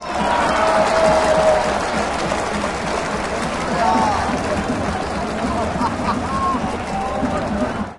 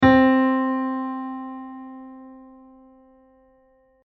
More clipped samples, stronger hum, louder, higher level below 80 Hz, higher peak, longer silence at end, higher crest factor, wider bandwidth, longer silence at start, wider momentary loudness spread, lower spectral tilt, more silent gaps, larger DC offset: neither; neither; about the same, -19 LUFS vs -21 LUFS; first, -36 dBFS vs -50 dBFS; about the same, -4 dBFS vs -4 dBFS; second, 0 s vs 1.7 s; about the same, 16 dB vs 18 dB; first, 11.5 kHz vs 5.8 kHz; about the same, 0 s vs 0 s; second, 7 LU vs 26 LU; about the same, -5 dB/octave vs -5 dB/octave; neither; neither